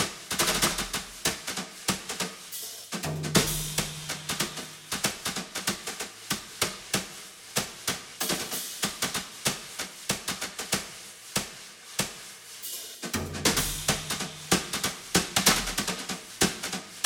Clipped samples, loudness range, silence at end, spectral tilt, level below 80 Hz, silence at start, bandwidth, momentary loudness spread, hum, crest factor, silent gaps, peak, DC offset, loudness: under 0.1%; 5 LU; 0 s; -2 dB/octave; -50 dBFS; 0 s; over 20 kHz; 11 LU; none; 24 dB; none; -6 dBFS; under 0.1%; -29 LUFS